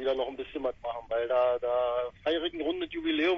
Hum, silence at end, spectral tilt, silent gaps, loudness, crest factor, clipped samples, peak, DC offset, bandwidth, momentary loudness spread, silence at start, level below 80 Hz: none; 0 s; -5.5 dB/octave; none; -31 LUFS; 14 dB; under 0.1%; -16 dBFS; under 0.1%; 6.6 kHz; 8 LU; 0 s; -58 dBFS